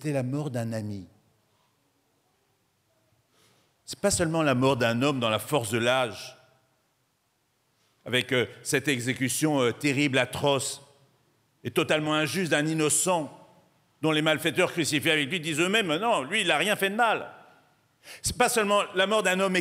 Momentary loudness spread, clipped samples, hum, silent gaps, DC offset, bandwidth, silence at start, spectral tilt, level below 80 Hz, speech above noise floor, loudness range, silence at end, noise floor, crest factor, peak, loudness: 9 LU; under 0.1%; none; none; under 0.1%; 16 kHz; 0 s; -3.5 dB/octave; -60 dBFS; 46 dB; 6 LU; 0 s; -72 dBFS; 20 dB; -8 dBFS; -25 LUFS